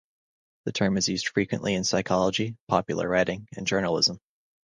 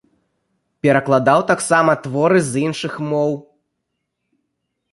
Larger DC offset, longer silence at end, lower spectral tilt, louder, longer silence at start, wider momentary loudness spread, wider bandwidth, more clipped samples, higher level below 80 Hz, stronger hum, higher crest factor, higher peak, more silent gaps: neither; second, 0.5 s vs 1.5 s; second, -4 dB/octave vs -5.5 dB/octave; second, -26 LUFS vs -17 LUFS; second, 0.65 s vs 0.85 s; about the same, 6 LU vs 8 LU; second, 10 kHz vs 11.5 kHz; neither; about the same, -56 dBFS vs -60 dBFS; neither; about the same, 20 dB vs 18 dB; second, -6 dBFS vs 0 dBFS; first, 2.60-2.67 s vs none